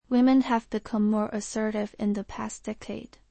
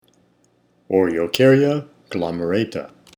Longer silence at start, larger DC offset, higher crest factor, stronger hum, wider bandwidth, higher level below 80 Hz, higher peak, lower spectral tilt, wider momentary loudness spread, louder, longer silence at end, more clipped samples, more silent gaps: second, 0.1 s vs 0.9 s; neither; about the same, 16 dB vs 20 dB; second, none vs 60 Hz at -50 dBFS; second, 8.8 kHz vs over 20 kHz; about the same, -56 dBFS vs -56 dBFS; second, -12 dBFS vs 0 dBFS; about the same, -5.5 dB/octave vs -6.5 dB/octave; about the same, 15 LU vs 13 LU; second, -27 LUFS vs -19 LUFS; about the same, 0.25 s vs 0.3 s; neither; neither